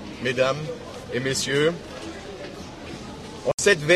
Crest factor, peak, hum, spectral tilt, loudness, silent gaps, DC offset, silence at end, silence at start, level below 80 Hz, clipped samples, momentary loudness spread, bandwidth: 20 dB; -6 dBFS; none; -3.5 dB/octave; -24 LUFS; 3.54-3.58 s; under 0.1%; 0 s; 0 s; -52 dBFS; under 0.1%; 16 LU; 13 kHz